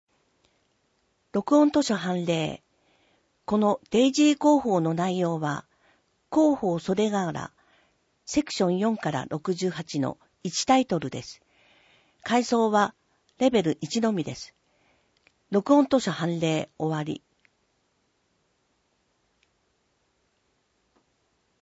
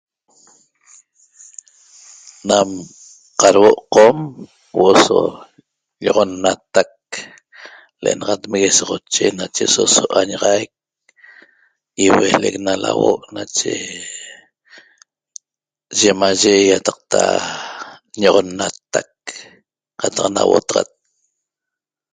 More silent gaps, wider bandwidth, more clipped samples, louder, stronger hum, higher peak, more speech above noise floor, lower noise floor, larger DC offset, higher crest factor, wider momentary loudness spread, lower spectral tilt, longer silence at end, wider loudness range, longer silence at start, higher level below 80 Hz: neither; second, 8 kHz vs 10 kHz; neither; second, -25 LUFS vs -15 LUFS; neither; second, -8 dBFS vs 0 dBFS; second, 47 dB vs 72 dB; second, -72 dBFS vs -87 dBFS; neither; about the same, 20 dB vs 18 dB; second, 15 LU vs 18 LU; first, -5.5 dB/octave vs -2.5 dB/octave; first, 4.6 s vs 1.3 s; about the same, 5 LU vs 7 LU; second, 1.35 s vs 2.45 s; second, -64 dBFS vs -56 dBFS